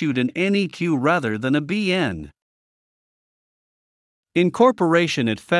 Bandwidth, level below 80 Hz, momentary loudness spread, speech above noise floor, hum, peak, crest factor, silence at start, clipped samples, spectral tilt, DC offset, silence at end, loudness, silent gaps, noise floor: 12 kHz; -58 dBFS; 6 LU; over 70 dB; none; -4 dBFS; 18 dB; 0 s; under 0.1%; -6 dB/octave; under 0.1%; 0 s; -20 LUFS; 2.42-4.23 s; under -90 dBFS